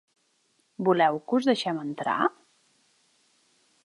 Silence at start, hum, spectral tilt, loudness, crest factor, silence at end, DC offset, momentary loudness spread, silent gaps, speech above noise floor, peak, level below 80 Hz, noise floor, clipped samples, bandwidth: 0.8 s; none; -5.5 dB/octave; -26 LUFS; 20 dB; 1.55 s; under 0.1%; 7 LU; none; 45 dB; -10 dBFS; -80 dBFS; -70 dBFS; under 0.1%; 11.5 kHz